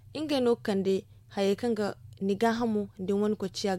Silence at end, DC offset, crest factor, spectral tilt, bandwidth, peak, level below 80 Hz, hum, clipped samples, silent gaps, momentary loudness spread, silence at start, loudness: 0 s; under 0.1%; 16 dB; -6 dB/octave; 15 kHz; -12 dBFS; -62 dBFS; none; under 0.1%; none; 6 LU; 0.1 s; -29 LUFS